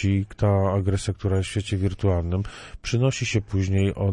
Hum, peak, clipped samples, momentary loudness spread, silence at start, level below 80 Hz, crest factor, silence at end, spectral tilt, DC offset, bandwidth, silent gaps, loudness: none; -8 dBFS; under 0.1%; 6 LU; 0 s; -42 dBFS; 14 dB; 0 s; -6.5 dB/octave; under 0.1%; 10.5 kHz; none; -24 LUFS